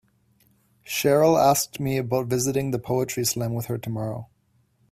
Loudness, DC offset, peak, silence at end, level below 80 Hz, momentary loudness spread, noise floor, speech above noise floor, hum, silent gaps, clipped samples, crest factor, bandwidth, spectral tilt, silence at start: -23 LUFS; under 0.1%; -6 dBFS; 0.65 s; -58 dBFS; 12 LU; -65 dBFS; 42 dB; none; none; under 0.1%; 18 dB; 16 kHz; -5 dB/octave; 0.85 s